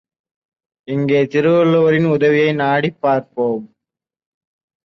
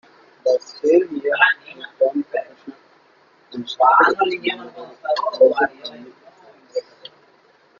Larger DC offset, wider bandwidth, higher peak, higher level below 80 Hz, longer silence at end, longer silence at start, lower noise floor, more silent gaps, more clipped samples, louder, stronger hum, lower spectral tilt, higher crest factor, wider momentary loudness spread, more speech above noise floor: neither; second, 6.4 kHz vs 7.2 kHz; second, -4 dBFS vs 0 dBFS; first, -60 dBFS vs -70 dBFS; first, 1.2 s vs 1 s; first, 0.9 s vs 0.45 s; first, -85 dBFS vs -55 dBFS; neither; neither; first, -15 LUFS vs -19 LUFS; neither; first, -8 dB/octave vs -4 dB/octave; second, 14 dB vs 20 dB; second, 8 LU vs 20 LU; first, 71 dB vs 37 dB